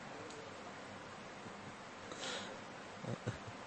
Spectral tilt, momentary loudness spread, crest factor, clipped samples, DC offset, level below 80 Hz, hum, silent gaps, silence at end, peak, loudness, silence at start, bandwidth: -4 dB/octave; 7 LU; 22 dB; under 0.1%; under 0.1%; -72 dBFS; none; none; 0 s; -26 dBFS; -48 LUFS; 0 s; 8.4 kHz